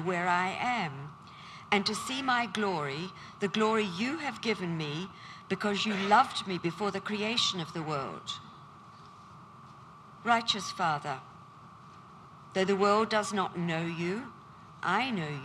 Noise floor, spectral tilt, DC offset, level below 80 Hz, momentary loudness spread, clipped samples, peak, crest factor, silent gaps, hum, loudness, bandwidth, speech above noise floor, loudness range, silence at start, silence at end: -52 dBFS; -4.5 dB/octave; under 0.1%; -72 dBFS; 24 LU; under 0.1%; -10 dBFS; 22 dB; none; none; -31 LUFS; 13.5 kHz; 21 dB; 4 LU; 0 s; 0 s